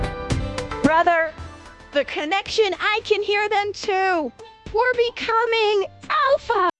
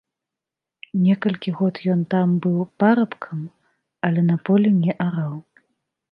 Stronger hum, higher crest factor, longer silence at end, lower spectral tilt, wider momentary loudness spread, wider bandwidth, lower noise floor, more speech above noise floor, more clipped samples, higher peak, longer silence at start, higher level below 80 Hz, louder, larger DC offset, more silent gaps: neither; about the same, 18 dB vs 18 dB; second, 0.1 s vs 0.7 s; second, -4.5 dB/octave vs -10.5 dB/octave; second, 8 LU vs 13 LU; first, 11 kHz vs 5.2 kHz; second, -41 dBFS vs -87 dBFS; second, 20 dB vs 67 dB; neither; about the same, -2 dBFS vs -4 dBFS; second, 0 s vs 0.95 s; first, -42 dBFS vs -68 dBFS; about the same, -21 LUFS vs -21 LUFS; neither; neither